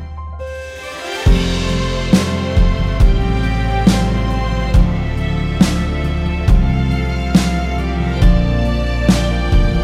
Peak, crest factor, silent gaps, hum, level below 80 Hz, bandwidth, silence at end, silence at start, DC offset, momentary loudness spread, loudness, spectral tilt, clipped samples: 0 dBFS; 14 dB; none; none; -18 dBFS; 13 kHz; 0 s; 0 s; under 0.1%; 5 LU; -16 LUFS; -6.5 dB/octave; under 0.1%